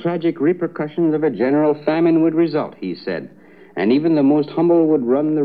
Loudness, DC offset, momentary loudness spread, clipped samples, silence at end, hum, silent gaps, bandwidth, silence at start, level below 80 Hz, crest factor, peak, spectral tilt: -18 LUFS; 0.2%; 11 LU; under 0.1%; 0 s; none; none; 5 kHz; 0 s; -70 dBFS; 12 dB; -6 dBFS; -10.5 dB/octave